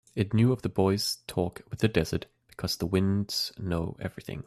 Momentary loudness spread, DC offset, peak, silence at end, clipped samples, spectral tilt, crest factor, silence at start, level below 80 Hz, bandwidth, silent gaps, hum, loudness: 11 LU; under 0.1%; -10 dBFS; 0.05 s; under 0.1%; -5.5 dB/octave; 18 dB; 0.15 s; -54 dBFS; 14.5 kHz; none; none; -29 LUFS